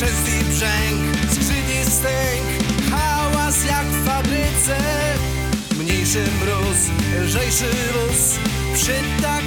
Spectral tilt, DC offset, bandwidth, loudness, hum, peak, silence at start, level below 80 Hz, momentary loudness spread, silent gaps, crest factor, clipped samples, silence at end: -3.5 dB/octave; under 0.1%; over 20 kHz; -18 LUFS; none; -4 dBFS; 0 s; -26 dBFS; 3 LU; none; 16 dB; under 0.1%; 0 s